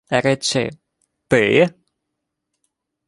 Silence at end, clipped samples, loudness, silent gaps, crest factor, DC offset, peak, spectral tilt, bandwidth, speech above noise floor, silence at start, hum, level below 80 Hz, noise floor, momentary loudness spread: 1.4 s; under 0.1%; -18 LUFS; none; 20 dB; under 0.1%; -2 dBFS; -4.5 dB/octave; 11.5 kHz; 62 dB; 0.1 s; none; -56 dBFS; -78 dBFS; 7 LU